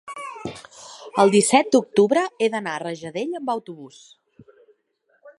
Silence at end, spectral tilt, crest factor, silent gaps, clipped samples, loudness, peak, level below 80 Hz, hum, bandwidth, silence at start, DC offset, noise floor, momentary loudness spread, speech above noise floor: 0.1 s; -4 dB/octave; 22 dB; none; under 0.1%; -20 LUFS; -2 dBFS; -68 dBFS; none; 11.5 kHz; 0.05 s; under 0.1%; -67 dBFS; 23 LU; 46 dB